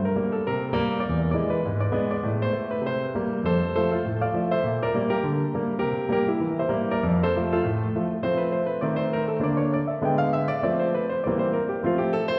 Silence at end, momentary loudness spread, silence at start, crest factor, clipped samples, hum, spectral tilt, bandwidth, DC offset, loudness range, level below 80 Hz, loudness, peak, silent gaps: 0 s; 3 LU; 0 s; 14 dB; under 0.1%; none; -10.5 dB/octave; 5.8 kHz; under 0.1%; 1 LU; -48 dBFS; -25 LUFS; -10 dBFS; none